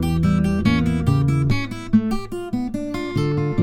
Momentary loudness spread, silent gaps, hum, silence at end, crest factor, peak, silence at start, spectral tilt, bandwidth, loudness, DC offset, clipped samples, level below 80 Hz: 7 LU; none; none; 0 s; 16 dB; -4 dBFS; 0 s; -7.5 dB/octave; 15 kHz; -21 LUFS; under 0.1%; under 0.1%; -34 dBFS